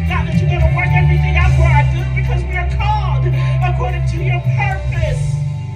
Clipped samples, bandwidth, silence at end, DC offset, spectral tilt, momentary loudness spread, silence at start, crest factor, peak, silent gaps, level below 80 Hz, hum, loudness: under 0.1%; 9.6 kHz; 0 s; under 0.1%; -7.5 dB/octave; 6 LU; 0 s; 14 dB; 0 dBFS; none; -20 dBFS; none; -15 LUFS